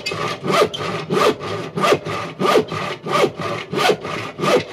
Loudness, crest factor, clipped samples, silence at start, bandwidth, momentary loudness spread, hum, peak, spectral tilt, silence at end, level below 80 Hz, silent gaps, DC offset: -19 LUFS; 16 dB; under 0.1%; 0 s; 15.5 kHz; 8 LU; none; -4 dBFS; -4.5 dB/octave; 0 s; -56 dBFS; none; under 0.1%